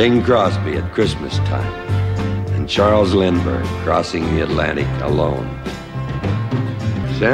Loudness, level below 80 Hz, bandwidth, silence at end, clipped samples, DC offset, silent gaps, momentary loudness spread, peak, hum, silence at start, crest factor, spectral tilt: -18 LUFS; -34 dBFS; 10.5 kHz; 0 s; under 0.1%; under 0.1%; none; 8 LU; -2 dBFS; none; 0 s; 14 dB; -7 dB/octave